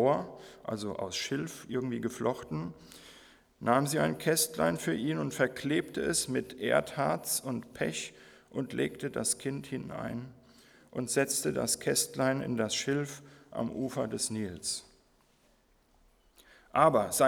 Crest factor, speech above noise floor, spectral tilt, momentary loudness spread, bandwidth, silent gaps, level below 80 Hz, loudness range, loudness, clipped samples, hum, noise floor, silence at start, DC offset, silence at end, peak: 24 dB; 36 dB; -4 dB/octave; 12 LU; over 20 kHz; none; -64 dBFS; 6 LU; -32 LUFS; under 0.1%; none; -67 dBFS; 0 s; under 0.1%; 0 s; -8 dBFS